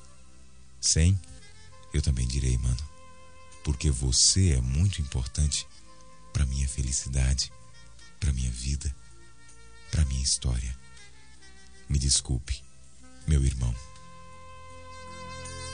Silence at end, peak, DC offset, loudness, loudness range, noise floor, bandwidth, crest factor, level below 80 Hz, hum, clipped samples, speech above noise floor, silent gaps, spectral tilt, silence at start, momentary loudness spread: 0 s; -10 dBFS; 0.4%; -27 LUFS; 6 LU; -55 dBFS; 10.5 kHz; 18 dB; -34 dBFS; none; under 0.1%; 29 dB; none; -3.5 dB/octave; 0.8 s; 21 LU